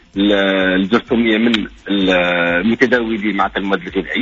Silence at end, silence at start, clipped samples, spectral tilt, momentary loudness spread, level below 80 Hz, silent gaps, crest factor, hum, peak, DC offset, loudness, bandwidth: 0 s; 0.15 s; under 0.1%; -3 dB/octave; 6 LU; -42 dBFS; none; 14 dB; none; -2 dBFS; under 0.1%; -15 LUFS; 7.6 kHz